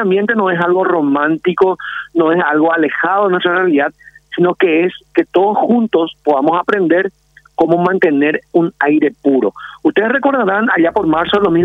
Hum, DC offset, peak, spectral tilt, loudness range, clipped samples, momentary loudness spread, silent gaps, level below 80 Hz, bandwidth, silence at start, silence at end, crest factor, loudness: none; under 0.1%; 0 dBFS; -8 dB/octave; 1 LU; under 0.1%; 4 LU; none; -54 dBFS; 4.8 kHz; 0 s; 0 s; 12 dB; -13 LUFS